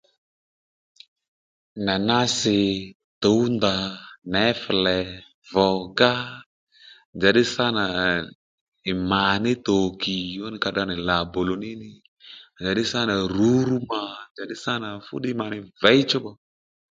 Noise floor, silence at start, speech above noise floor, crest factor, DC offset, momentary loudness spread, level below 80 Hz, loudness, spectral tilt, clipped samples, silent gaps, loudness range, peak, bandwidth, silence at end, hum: under -90 dBFS; 1.75 s; over 67 dB; 24 dB; under 0.1%; 15 LU; -52 dBFS; -23 LUFS; -4.5 dB/octave; under 0.1%; 2.95-3.21 s, 4.18-4.22 s, 5.34-5.42 s, 6.46-6.67 s, 7.05-7.13 s, 8.35-8.72 s, 12.08-12.17 s, 14.31-14.35 s; 3 LU; 0 dBFS; 9.4 kHz; 0.55 s; none